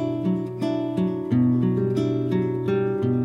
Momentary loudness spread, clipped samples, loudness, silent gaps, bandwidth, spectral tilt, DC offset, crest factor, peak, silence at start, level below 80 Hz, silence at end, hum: 5 LU; under 0.1%; -23 LUFS; none; 9.2 kHz; -9.5 dB/octave; under 0.1%; 12 dB; -10 dBFS; 0 s; -58 dBFS; 0 s; none